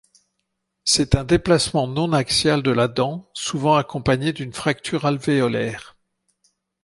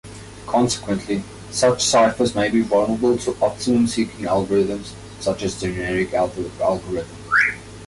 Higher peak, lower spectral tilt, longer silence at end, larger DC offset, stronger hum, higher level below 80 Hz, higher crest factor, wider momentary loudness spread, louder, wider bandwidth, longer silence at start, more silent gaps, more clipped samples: first, -2 dBFS vs -6 dBFS; about the same, -4.5 dB/octave vs -4 dB/octave; first, 1 s vs 0 s; neither; neither; about the same, -42 dBFS vs -46 dBFS; first, 20 dB vs 14 dB; about the same, 8 LU vs 10 LU; about the same, -20 LUFS vs -20 LUFS; about the same, 11.5 kHz vs 11.5 kHz; first, 0.85 s vs 0.05 s; neither; neither